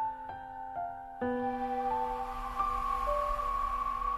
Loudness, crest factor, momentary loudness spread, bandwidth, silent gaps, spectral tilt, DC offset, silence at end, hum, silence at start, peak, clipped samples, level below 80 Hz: -34 LUFS; 14 dB; 9 LU; 13.5 kHz; none; -6 dB/octave; under 0.1%; 0 s; none; 0 s; -20 dBFS; under 0.1%; -46 dBFS